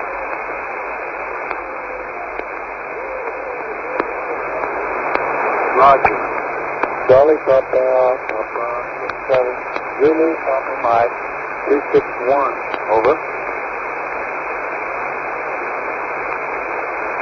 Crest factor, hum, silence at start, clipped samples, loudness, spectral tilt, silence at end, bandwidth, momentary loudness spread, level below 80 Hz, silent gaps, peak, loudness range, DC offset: 18 dB; none; 0 s; under 0.1%; -18 LUFS; -6.5 dB/octave; 0 s; 6.4 kHz; 11 LU; -50 dBFS; none; 0 dBFS; 9 LU; under 0.1%